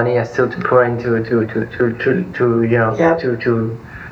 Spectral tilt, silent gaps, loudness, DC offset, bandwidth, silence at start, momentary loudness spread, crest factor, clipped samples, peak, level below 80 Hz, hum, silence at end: -8.5 dB/octave; none; -16 LUFS; under 0.1%; 7 kHz; 0 s; 5 LU; 14 dB; under 0.1%; -2 dBFS; -48 dBFS; none; 0 s